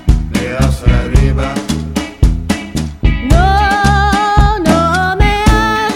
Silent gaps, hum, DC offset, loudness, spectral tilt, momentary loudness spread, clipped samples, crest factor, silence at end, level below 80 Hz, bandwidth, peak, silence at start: none; none; 0.2%; -12 LUFS; -5.5 dB/octave; 7 LU; under 0.1%; 12 dB; 0 s; -14 dBFS; 16 kHz; 0 dBFS; 0 s